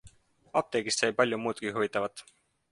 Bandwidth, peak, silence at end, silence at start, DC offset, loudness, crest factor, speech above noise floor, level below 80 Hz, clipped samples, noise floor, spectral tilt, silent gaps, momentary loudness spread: 11.5 kHz; -10 dBFS; 0.5 s; 0.05 s; under 0.1%; -30 LUFS; 22 dB; 28 dB; -68 dBFS; under 0.1%; -58 dBFS; -3 dB/octave; none; 7 LU